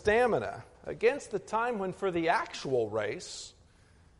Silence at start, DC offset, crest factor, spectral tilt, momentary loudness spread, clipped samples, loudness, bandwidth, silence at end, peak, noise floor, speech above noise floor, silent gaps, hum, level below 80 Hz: 0 s; under 0.1%; 18 dB; -4.5 dB/octave; 15 LU; under 0.1%; -31 LUFS; 11.5 kHz; 0.7 s; -12 dBFS; -60 dBFS; 30 dB; none; none; -58 dBFS